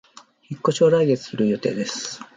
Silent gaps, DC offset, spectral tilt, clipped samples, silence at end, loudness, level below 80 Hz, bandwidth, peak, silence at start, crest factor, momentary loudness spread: none; under 0.1%; -5.5 dB/octave; under 0.1%; 0.1 s; -21 LUFS; -66 dBFS; 9.4 kHz; -6 dBFS; 0.5 s; 16 dB; 11 LU